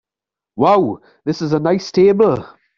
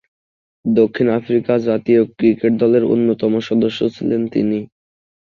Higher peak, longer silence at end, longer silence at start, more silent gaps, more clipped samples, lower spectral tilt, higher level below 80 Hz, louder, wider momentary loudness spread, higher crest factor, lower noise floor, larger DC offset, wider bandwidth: about the same, -2 dBFS vs -2 dBFS; second, 0.3 s vs 0.65 s; about the same, 0.55 s vs 0.65 s; neither; neither; second, -7 dB/octave vs -8.5 dB/octave; about the same, -54 dBFS vs -56 dBFS; about the same, -16 LUFS vs -17 LUFS; first, 12 LU vs 6 LU; about the same, 14 dB vs 14 dB; about the same, -87 dBFS vs under -90 dBFS; neither; about the same, 7.2 kHz vs 7 kHz